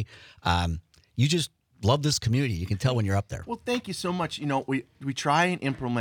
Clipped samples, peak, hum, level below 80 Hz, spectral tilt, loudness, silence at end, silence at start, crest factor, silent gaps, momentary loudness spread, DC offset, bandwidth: under 0.1%; -8 dBFS; none; -52 dBFS; -5 dB/octave; -27 LUFS; 0 s; 0 s; 18 dB; none; 11 LU; under 0.1%; 19 kHz